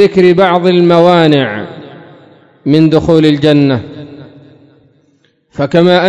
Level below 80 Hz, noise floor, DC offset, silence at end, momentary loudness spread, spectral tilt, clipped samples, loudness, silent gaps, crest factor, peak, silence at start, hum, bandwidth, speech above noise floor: -44 dBFS; -53 dBFS; under 0.1%; 0 s; 20 LU; -7.5 dB/octave; 2%; -9 LUFS; none; 10 dB; 0 dBFS; 0 s; none; 9.2 kHz; 46 dB